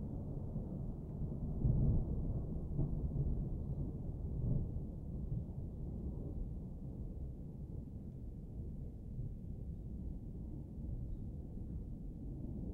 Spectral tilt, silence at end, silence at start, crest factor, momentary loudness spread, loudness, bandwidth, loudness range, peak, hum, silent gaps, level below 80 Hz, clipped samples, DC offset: -12.5 dB/octave; 0 s; 0 s; 18 dB; 9 LU; -44 LUFS; 1.6 kHz; 8 LU; -22 dBFS; none; none; -44 dBFS; under 0.1%; under 0.1%